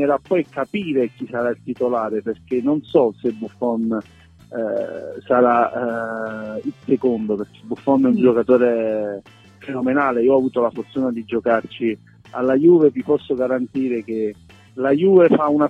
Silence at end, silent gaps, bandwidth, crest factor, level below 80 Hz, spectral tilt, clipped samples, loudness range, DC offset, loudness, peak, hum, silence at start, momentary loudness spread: 0 s; none; 5.8 kHz; 16 dB; -60 dBFS; -8.5 dB/octave; under 0.1%; 4 LU; under 0.1%; -19 LUFS; -2 dBFS; none; 0 s; 13 LU